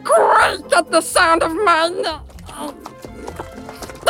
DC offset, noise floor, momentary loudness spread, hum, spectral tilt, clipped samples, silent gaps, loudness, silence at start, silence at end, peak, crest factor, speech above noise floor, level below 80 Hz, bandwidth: under 0.1%; -35 dBFS; 20 LU; none; -2.5 dB/octave; under 0.1%; none; -15 LUFS; 0 s; 0 s; -2 dBFS; 14 dB; 19 dB; -44 dBFS; 17 kHz